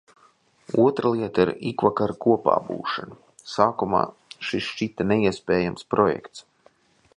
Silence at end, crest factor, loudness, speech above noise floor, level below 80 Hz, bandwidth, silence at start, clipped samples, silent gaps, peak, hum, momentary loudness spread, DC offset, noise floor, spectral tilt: 0.75 s; 22 dB; -24 LUFS; 37 dB; -56 dBFS; 10.5 kHz; 0.7 s; under 0.1%; none; -4 dBFS; none; 11 LU; under 0.1%; -60 dBFS; -6.5 dB/octave